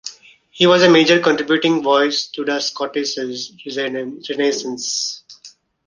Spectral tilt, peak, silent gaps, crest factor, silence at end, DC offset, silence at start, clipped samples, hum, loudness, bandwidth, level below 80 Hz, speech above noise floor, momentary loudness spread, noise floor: -3.5 dB/octave; 0 dBFS; none; 18 dB; 0.4 s; under 0.1%; 0.05 s; under 0.1%; none; -17 LUFS; 10 kHz; -62 dBFS; 29 dB; 15 LU; -46 dBFS